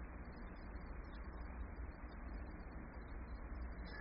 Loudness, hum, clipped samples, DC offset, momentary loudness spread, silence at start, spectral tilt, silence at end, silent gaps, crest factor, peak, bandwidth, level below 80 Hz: -52 LUFS; none; under 0.1%; under 0.1%; 3 LU; 0 s; -6.5 dB/octave; 0 s; none; 12 dB; -38 dBFS; 5.4 kHz; -50 dBFS